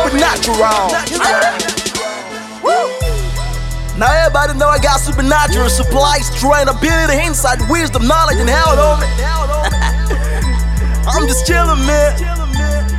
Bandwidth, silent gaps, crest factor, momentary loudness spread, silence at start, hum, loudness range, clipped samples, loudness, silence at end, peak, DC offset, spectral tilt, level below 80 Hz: 15.5 kHz; none; 12 dB; 7 LU; 0 s; none; 3 LU; under 0.1%; -13 LUFS; 0 s; 0 dBFS; under 0.1%; -4 dB/octave; -16 dBFS